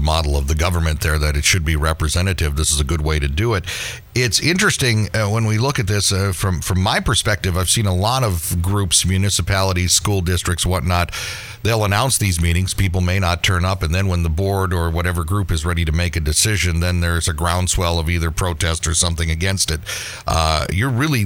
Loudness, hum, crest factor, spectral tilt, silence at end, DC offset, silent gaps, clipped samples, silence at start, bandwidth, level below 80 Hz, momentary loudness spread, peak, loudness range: -18 LUFS; none; 16 dB; -4 dB/octave; 0 s; under 0.1%; none; under 0.1%; 0 s; 17 kHz; -26 dBFS; 5 LU; -2 dBFS; 2 LU